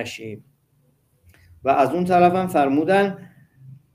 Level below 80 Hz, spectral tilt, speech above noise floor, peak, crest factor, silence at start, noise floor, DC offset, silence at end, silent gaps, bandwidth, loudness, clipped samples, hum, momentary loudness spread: -60 dBFS; -6.5 dB/octave; 44 dB; -4 dBFS; 18 dB; 0 s; -63 dBFS; under 0.1%; 0.2 s; none; 16 kHz; -19 LUFS; under 0.1%; none; 20 LU